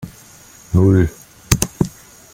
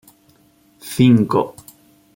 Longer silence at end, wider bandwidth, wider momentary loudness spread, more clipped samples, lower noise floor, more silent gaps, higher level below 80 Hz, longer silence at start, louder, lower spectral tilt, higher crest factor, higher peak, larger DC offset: second, 0.45 s vs 0.65 s; about the same, 17 kHz vs 17 kHz; second, 10 LU vs 17 LU; neither; second, -43 dBFS vs -55 dBFS; neither; first, -34 dBFS vs -56 dBFS; second, 0 s vs 0.85 s; about the same, -17 LUFS vs -16 LUFS; second, -5.5 dB/octave vs -7 dB/octave; about the same, 18 dB vs 18 dB; about the same, 0 dBFS vs -2 dBFS; neither